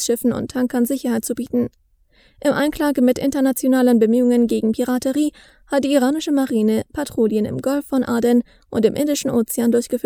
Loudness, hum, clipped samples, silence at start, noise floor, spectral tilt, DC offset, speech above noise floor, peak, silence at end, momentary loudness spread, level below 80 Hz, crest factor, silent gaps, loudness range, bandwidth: -19 LUFS; none; under 0.1%; 0 s; -56 dBFS; -5 dB/octave; under 0.1%; 37 dB; -2 dBFS; 0.05 s; 7 LU; -50 dBFS; 16 dB; none; 3 LU; over 20 kHz